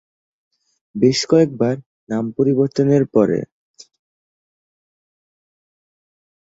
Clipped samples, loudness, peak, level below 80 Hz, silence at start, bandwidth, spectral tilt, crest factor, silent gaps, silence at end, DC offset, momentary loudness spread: under 0.1%; -17 LUFS; -2 dBFS; -60 dBFS; 0.95 s; 7.8 kHz; -6.5 dB/octave; 18 dB; 1.86-2.07 s; 3.05 s; under 0.1%; 12 LU